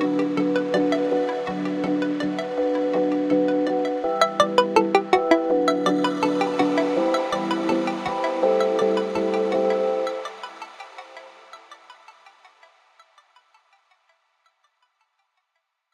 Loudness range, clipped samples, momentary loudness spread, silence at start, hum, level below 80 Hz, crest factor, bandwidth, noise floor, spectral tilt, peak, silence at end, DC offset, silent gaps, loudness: 8 LU; under 0.1%; 9 LU; 0 s; none; -66 dBFS; 20 dB; 12.5 kHz; -77 dBFS; -5.5 dB/octave; -4 dBFS; 3.85 s; under 0.1%; none; -22 LUFS